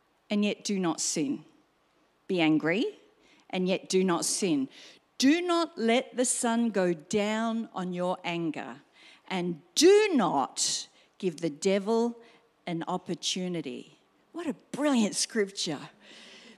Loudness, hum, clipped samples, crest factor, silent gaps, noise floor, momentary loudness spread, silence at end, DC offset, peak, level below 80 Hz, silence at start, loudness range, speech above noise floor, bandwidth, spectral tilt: -28 LUFS; none; under 0.1%; 20 dB; none; -68 dBFS; 13 LU; 0.05 s; under 0.1%; -10 dBFS; -80 dBFS; 0.3 s; 5 LU; 40 dB; 14.5 kHz; -4 dB/octave